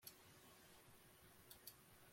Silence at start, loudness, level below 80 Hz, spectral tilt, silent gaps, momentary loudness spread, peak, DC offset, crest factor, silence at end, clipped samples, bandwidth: 0 s; -64 LUFS; -82 dBFS; -2.5 dB/octave; none; 6 LU; -40 dBFS; under 0.1%; 26 dB; 0 s; under 0.1%; 16.5 kHz